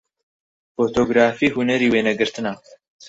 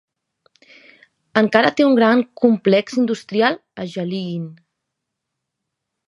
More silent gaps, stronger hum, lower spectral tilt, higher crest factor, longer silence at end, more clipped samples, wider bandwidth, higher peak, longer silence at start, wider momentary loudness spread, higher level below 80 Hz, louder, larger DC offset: neither; neither; about the same, -5 dB/octave vs -6 dB/octave; about the same, 18 dB vs 18 dB; second, 0.55 s vs 1.55 s; neither; second, 8 kHz vs 11 kHz; about the same, -2 dBFS vs 0 dBFS; second, 0.8 s vs 1.35 s; about the same, 12 LU vs 14 LU; first, -54 dBFS vs -68 dBFS; about the same, -19 LUFS vs -17 LUFS; neither